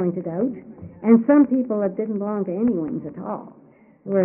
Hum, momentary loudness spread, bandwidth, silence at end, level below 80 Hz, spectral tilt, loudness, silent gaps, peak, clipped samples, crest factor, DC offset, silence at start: none; 17 LU; 2.8 kHz; 0 s; -62 dBFS; -6.5 dB/octave; -21 LUFS; none; -4 dBFS; under 0.1%; 18 dB; under 0.1%; 0 s